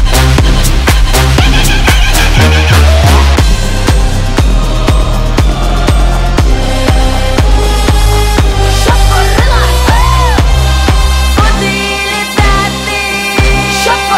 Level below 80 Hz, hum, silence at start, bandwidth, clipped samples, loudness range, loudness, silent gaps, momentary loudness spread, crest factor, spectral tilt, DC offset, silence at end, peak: -10 dBFS; none; 0 s; 16.5 kHz; 0.3%; 3 LU; -9 LUFS; none; 4 LU; 6 dB; -4.5 dB/octave; under 0.1%; 0 s; 0 dBFS